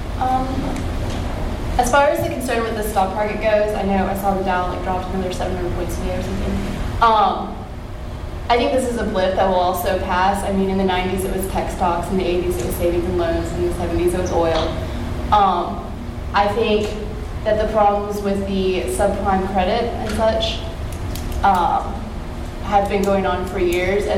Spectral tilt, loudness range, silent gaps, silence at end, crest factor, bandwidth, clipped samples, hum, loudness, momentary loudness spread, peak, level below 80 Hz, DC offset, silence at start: -5.5 dB/octave; 2 LU; none; 0 s; 18 dB; 16.5 kHz; under 0.1%; none; -20 LUFS; 10 LU; -2 dBFS; -28 dBFS; under 0.1%; 0 s